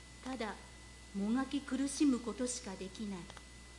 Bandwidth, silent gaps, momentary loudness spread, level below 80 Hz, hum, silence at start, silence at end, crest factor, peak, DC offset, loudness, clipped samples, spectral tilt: 11.5 kHz; none; 18 LU; -58 dBFS; none; 0 s; 0 s; 16 dB; -22 dBFS; under 0.1%; -38 LUFS; under 0.1%; -4 dB/octave